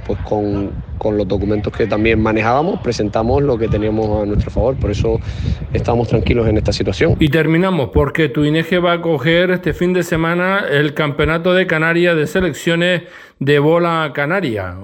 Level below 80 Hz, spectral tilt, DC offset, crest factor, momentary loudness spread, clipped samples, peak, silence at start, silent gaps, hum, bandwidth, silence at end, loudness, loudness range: -30 dBFS; -6.5 dB/octave; under 0.1%; 14 dB; 5 LU; under 0.1%; 0 dBFS; 0 s; none; none; 17 kHz; 0 s; -16 LUFS; 2 LU